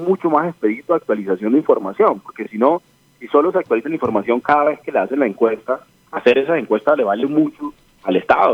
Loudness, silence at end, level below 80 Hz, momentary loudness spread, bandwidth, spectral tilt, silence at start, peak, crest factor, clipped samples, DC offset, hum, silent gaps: -18 LUFS; 0 s; -60 dBFS; 8 LU; 7.4 kHz; -7.5 dB/octave; 0 s; 0 dBFS; 16 dB; under 0.1%; under 0.1%; none; none